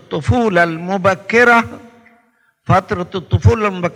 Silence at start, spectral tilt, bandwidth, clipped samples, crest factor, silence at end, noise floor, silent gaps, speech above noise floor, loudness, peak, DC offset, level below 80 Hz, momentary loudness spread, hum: 0.1 s; -6.5 dB/octave; 11.5 kHz; under 0.1%; 16 dB; 0 s; -57 dBFS; none; 43 dB; -14 LUFS; 0 dBFS; under 0.1%; -40 dBFS; 11 LU; none